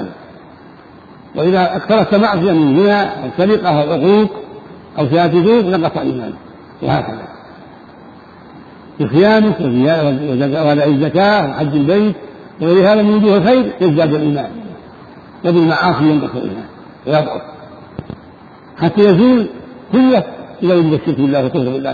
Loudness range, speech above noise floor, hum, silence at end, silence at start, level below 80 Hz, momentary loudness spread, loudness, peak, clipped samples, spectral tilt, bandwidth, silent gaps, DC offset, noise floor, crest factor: 5 LU; 26 dB; none; 0 s; 0 s; -50 dBFS; 19 LU; -13 LUFS; 0 dBFS; under 0.1%; -9 dB/octave; 4.9 kHz; none; under 0.1%; -39 dBFS; 14 dB